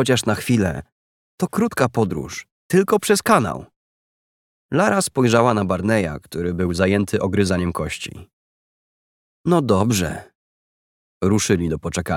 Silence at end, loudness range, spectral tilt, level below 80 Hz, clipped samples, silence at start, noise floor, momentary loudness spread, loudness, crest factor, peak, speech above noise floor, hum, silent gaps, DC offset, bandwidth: 0 s; 4 LU; -5.5 dB/octave; -46 dBFS; under 0.1%; 0 s; under -90 dBFS; 11 LU; -20 LUFS; 20 dB; 0 dBFS; over 71 dB; none; 0.92-1.38 s, 2.51-2.70 s, 3.76-4.69 s, 8.33-9.44 s, 10.35-11.21 s; under 0.1%; 17.5 kHz